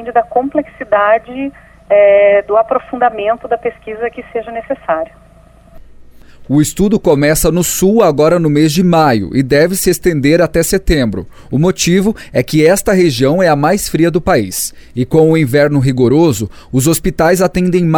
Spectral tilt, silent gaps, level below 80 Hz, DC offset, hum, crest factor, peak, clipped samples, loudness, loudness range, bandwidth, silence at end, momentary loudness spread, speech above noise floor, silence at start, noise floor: -5.5 dB/octave; none; -32 dBFS; under 0.1%; none; 12 dB; 0 dBFS; under 0.1%; -12 LUFS; 7 LU; 19 kHz; 0 s; 10 LU; 31 dB; 0 s; -42 dBFS